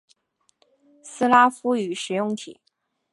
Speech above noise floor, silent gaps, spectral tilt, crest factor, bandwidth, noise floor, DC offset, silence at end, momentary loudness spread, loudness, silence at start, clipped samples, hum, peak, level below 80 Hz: 48 dB; none; -4 dB/octave; 22 dB; 11.5 kHz; -69 dBFS; under 0.1%; 0.6 s; 20 LU; -21 LUFS; 1.05 s; under 0.1%; none; -4 dBFS; -78 dBFS